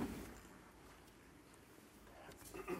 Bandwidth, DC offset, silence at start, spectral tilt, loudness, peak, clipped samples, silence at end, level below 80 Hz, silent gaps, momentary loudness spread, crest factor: 16 kHz; under 0.1%; 0 s; -5 dB/octave; -57 LUFS; -32 dBFS; under 0.1%; 0 s; -66 dBFS; none; 10 LU; 20 dB